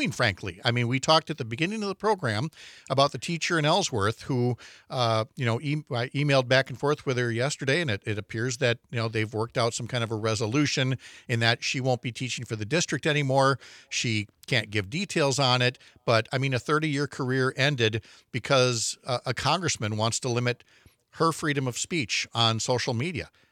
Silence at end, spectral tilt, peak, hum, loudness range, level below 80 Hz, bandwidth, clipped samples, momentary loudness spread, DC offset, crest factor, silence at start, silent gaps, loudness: 0.25 s; -4.5 dB/octave; -4 dBFS; none; 2 LU; -66 dBFS; 14.5 kHz; under 0.1%; 8 LU; under 0.1%; 24 dB; 0 s; none; -26 LUFS